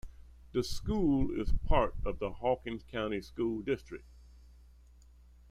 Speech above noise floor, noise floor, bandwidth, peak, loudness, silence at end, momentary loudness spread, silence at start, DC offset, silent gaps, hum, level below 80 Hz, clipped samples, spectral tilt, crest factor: 26 dB; -58 dBFS; 13.5 kHz; -14 dBFS; -34 LUFS; 1.15 s; 8 LU; 0.05 s; under 0.1%; none; 60 Hz at -55 dBFS; -40 dBFS; under 0.1%; -6.5 dB/octave; 20 dB